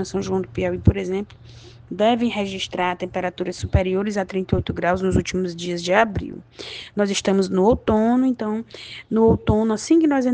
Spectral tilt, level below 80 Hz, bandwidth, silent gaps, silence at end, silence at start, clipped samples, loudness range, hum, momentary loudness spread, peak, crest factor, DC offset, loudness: -6 dB/octave; -38 dBFS; 9.8 kHz; none; 0 s; 0 s; under 0.1%; 4 LU; none; 12 LU; 0 dBFS; 20 dB; under 0.1%; -21 LUFS